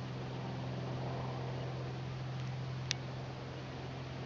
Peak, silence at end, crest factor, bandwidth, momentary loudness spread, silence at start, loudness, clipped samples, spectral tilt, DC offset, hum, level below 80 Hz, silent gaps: -10 dBFS; 0 s; 30 dB; 7.2 kHz; 5 LU; 0 s; -42 LUFS; under 0.1%; -5.5 dB/octave; under 0.1%; none; -62 dBFS; none